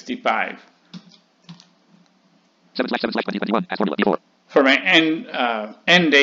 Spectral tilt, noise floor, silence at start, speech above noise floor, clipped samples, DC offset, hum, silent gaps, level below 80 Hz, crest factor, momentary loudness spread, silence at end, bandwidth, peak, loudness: -4.5 dB/octave; -59 dBFS; 0.05 s; 40 dB; under 0.1%; under 0.1%; none; none; -70 dBFS; 20 dB; 13 LU; 0 s; 7.8 kHz; -2 dBFS; -19 LUFS